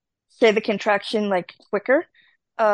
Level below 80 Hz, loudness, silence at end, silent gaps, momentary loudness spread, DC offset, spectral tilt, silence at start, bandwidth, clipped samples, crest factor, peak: -72 dBFS; -22 LUFS; 0 s; none; 10 LU; under 0.1%; -5 dB/octave; 0.4 s; 10 kHz; under 0.1%; 18 dB; -4 dBFS